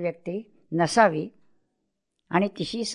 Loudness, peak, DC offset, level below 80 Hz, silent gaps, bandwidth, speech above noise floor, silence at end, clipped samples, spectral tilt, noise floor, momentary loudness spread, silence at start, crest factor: -25 LUFS; -6 dBFS; under 0.1%; -64 dBFS; none; 11 kHz; 54 dB; 0 s; under 0.1%; -5 dB/octave; -79 dBFS; 15 LU; 0 s; 22 dB